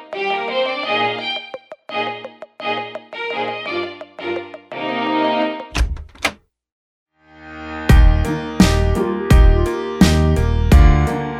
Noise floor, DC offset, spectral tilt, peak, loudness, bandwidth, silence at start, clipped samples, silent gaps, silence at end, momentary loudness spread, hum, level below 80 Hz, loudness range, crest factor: -40 dBFS; under 0.1%; -6 dB/octave; 0 dBFS; -18 LUFS; 15 kHz; 0 s; under 0.1%; 6.72-7.06 s; 0 s; 16 LU; none; -20 dBFS; 10 LU; 16 dB